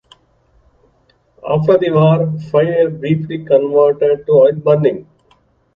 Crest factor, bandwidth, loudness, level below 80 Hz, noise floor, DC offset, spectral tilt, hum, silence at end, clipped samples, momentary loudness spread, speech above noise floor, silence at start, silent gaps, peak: 14 dB; 5.2 kHz; -13 LUFS; -54 dBFS; -56 dBFS; under 0.1%; -10 dB/octave; none; 0.75 s; under 0.1%; 7 LU; 43 dB; 1.45 s; none; 0 dBFS